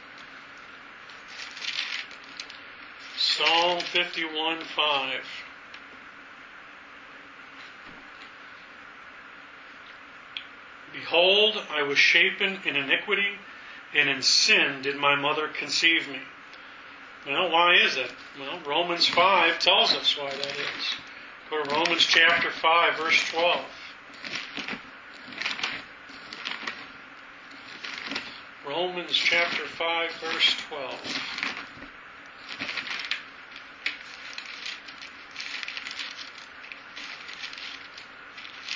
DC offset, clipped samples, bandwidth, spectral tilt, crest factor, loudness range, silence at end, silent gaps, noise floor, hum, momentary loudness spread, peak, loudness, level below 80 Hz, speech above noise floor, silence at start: under 0.1%; under 0.1%; 7.6 kHz; -1 dB/octave; 24 dB; 14 LU; 0 s; none; -46 dBFS; none; 25 LU; -4 dBFS; -24 LUFS; -70 dBFS; 22 dB; 0 s